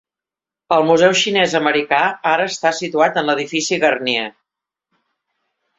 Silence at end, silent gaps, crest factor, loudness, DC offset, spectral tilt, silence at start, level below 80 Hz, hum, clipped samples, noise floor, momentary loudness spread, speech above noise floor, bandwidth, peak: 1.5 s; none; 16 dB; -16 LUFS; under 0.1%; -3 dB/octave; 0.7 s; -64 dBFS; none; under 0.1%; -88 dBFS; 7 LU; 72 dB; 8.2 kHz; -2 dBFS